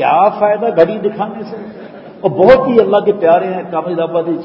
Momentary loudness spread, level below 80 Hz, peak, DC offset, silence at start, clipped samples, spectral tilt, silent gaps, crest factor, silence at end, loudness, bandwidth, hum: 18 LU; -48 dBFS; 0 dBFS; under 0.1%; 0 s; 0.3%; -8.5 dB/octave; none; 12 dB; 0 s; -12 LUFS; 5.8 kHz; none